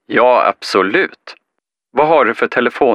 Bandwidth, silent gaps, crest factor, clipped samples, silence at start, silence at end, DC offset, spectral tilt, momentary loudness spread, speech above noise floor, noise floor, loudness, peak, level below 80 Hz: 12.5 kHz; none; 14 dB; under 0.1%; 0.1 s; 0 s; under 0.1%; -5 dB/octave; 5 LU; 63 dB; -76 dBFS; -13 LUFS; 0 dBFS; -58 dBFS